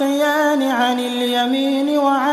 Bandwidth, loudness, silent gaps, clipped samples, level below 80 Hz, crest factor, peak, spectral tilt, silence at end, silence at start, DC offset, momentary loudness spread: 13.5 kHz; -17 LUFS; none; under 0.1%; -72 dBFS; 12 dB; -4 dBFS; -2.5 dB/octave; 0 s; 0 s; under 0.1%; 2 LU